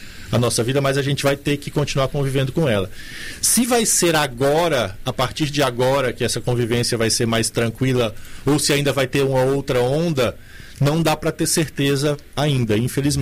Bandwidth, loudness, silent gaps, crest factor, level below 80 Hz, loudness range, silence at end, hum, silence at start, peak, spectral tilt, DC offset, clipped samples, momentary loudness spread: 16 kHz; -19 LUFS; none; 14 dB; -40 dBFS; 2 LU; 0 s; none; 0 s; -6 dBFS; -4.5 dB/octave; under 0.1%; under 0.1%; 6 LU